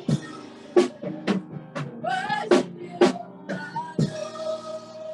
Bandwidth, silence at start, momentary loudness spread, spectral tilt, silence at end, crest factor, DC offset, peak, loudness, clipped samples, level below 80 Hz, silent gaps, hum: 11.5 kHz; 0 s; 14 LU; -6 dB/octave; 0 s; 22 dB; under 0.1%; -4 dBFS; -26 LUFS; under 0.1%; -66 dBFS; none; none